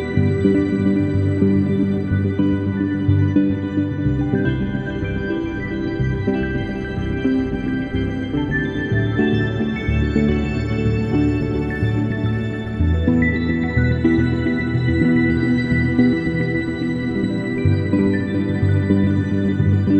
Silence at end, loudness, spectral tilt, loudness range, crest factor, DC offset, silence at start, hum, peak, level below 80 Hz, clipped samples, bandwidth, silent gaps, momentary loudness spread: 0 s; -19 LUFS; -9 dB/octave; 4 LU; 16 dB; under 0.1%; 0 s; none; -2 dBFS; -32 dBFS; under 0.1%; 8.4 kHz; none; 6 LU